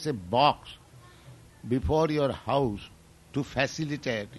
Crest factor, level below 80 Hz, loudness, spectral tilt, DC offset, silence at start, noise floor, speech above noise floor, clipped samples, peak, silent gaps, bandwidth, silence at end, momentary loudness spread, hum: 20 dB; -46 dBFS; -28 LUFS; -6 dB/octave; under 0.1%; 0 s; -52 dBFS; 24 dB; under 0.1%; -8 dBFS; none; 12 kHz; 0 s; 20 LU; none